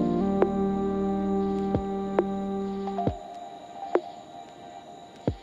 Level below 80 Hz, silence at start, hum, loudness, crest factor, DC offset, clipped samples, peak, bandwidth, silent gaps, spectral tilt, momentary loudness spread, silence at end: -48 dBFS; 0 s; none; -28 LUFS; 20 dB; under 0.1%; under 0.1%; -8 dBFS; 7.6 kHz; none; -8.5 dB/octave; 19 LU; 0 s